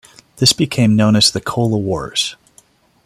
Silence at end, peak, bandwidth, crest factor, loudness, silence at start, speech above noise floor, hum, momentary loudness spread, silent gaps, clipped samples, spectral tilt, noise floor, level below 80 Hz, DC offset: 0.7 s; 0 dBFS; 15.5 kHz; 16 dB; -15 LUFS; 0.35 s; 37 dB; none; 8 LU; none; under 0.1%; -4.5 dB/octave; -52 dBFS; -48 dBFS; under 0.1%